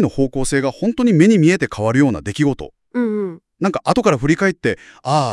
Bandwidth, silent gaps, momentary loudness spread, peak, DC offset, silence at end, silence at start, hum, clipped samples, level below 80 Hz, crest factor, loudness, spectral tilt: 12 kHz; none; 10 LU; 0 dBFS; under 0.1%; 0 s; 0 s; none; under 0.1%; -40 dBFS; 16 dB; -17 LUFS; -6 dB/octave